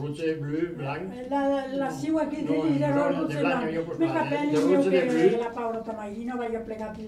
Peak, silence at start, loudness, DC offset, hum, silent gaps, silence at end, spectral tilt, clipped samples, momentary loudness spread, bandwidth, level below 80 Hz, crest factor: -8 dBFS; 0 s; -27 LUFS; under 0.1%; none; none; 0 s; -7 dB/octave; under 0.1%; 11 LU; 12.5 kHz; -58 dBFS; 18 dB